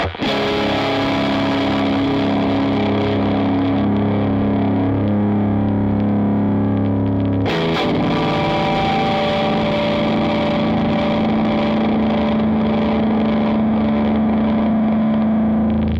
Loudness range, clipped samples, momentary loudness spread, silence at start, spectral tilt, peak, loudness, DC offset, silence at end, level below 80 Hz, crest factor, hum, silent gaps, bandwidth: 1 LU; under 0.1%; 1 LU; 0 s; -8 dB/octave; -8 dBFS; -17 LUFS; under 0.1%; 0 s; -38 dBFS; 10 dB; none; none; 7.4 kHz